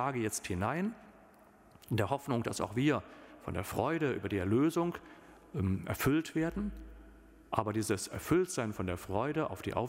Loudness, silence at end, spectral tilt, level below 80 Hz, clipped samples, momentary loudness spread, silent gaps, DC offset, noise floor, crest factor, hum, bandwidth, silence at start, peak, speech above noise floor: -34 LUFS; 0 s; -6 dB/octave; -56 dBFS; under 0.1%; 10 LU; none; under 0.1%; -60 dBFS; 22 dB; none; 16 kHz; 0 s; -12 dBFS; 27 dB